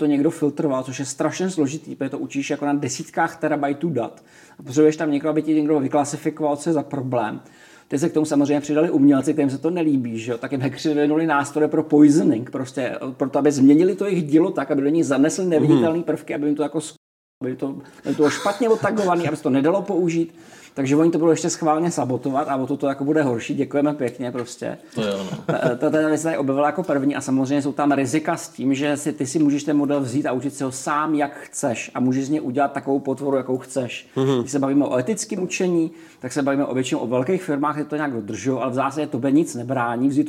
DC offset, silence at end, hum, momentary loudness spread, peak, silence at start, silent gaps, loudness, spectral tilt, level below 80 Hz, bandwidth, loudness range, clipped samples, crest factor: under 0.1%; 0 s; none; 9 LU; -2 dBFS; 0 s; 16.97-17.41 s; -21 LUFS; -6 dB/octave; -72 dBFS; 13.5 kHz; 5 LU; under 0.1%; 18 dB